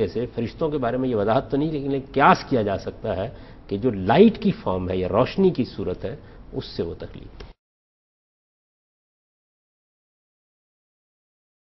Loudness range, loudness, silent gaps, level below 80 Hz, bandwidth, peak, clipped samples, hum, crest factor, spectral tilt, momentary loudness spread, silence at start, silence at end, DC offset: 16 LU; -22 LUFS; none; -46 dBFS; 6 kHz; -2 dBFS; under 0.1%; none; 22 dB; -8 dB/octave; 16 LU; 0 s; 4.3 s; under 0.1%